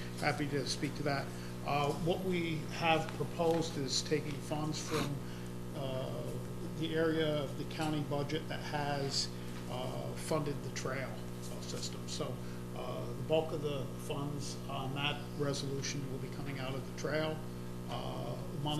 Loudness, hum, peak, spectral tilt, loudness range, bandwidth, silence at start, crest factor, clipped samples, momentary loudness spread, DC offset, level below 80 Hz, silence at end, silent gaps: -37 LUFS; 60 Hz at -45 dBFS; -16 dBFS; -5 dB/octave; 5 LU; 15 kHz; 0 s; 22 dB; under 0.1%; 9 LU; under 0.1%; -56 dBFS; 0 s; none